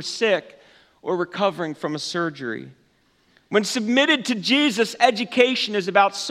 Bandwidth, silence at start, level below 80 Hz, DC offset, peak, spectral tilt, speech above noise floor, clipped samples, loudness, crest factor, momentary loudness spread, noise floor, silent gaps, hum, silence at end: 15 kHz; 0 s; -74 dBFS; under 0.1%; 0 dBFS; -3.5 dB/octave; 40 dB; under 0.1%; -21 LUFS; 22 dB; 10 LU; -62 dBFS; none; none; 0 s